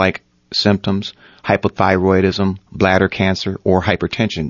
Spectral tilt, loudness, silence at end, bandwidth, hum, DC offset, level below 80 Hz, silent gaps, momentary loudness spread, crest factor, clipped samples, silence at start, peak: -6.5 dB/octave; -16 LUFS; 0 s; 7.2 kHz; none; under 0.1%; -44 dBFS; none; 7 LU; 16 dB; under 0.1%; 0 s; 0 dBFS